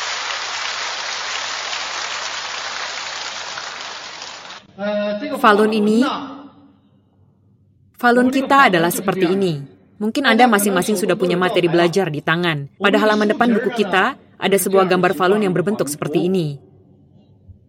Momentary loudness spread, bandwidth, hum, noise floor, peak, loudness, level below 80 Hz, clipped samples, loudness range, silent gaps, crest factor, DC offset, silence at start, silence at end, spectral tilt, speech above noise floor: 14 LU; 16.5 kHz; none; -55 dBFS; 0 dBFS; -18 LUFS; -66 dBFS; under 0.1%; 8 LU; none; 18 dB; under 0.1%; 0 s; 0.15 s; -4.5 dB/octave; 38 dB